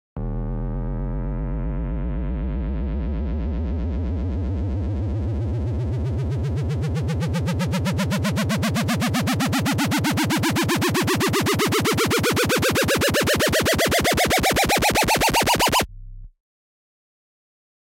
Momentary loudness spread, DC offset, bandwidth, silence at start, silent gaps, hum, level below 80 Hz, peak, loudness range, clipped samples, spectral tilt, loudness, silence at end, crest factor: 10 LU; under 0.1%; 17 kHz; 0.15 s; none; none; -30 dBFS; -6 dBFS; 8 LU; under 0.1%; -4.5 dB/octave; -22 LUFS; 1.7 s; 16 dB